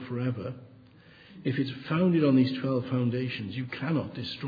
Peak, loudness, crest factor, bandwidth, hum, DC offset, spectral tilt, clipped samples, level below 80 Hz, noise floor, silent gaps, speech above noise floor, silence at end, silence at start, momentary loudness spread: -12 dBFS; -29 LUFS; 16 dB; 5 kHz; none; under 0.1%; -9 dB/octave; under 0.1%; -66 dBFS; -54 dBFS; none; 26 dB; 0 s; 0 s; 12 LU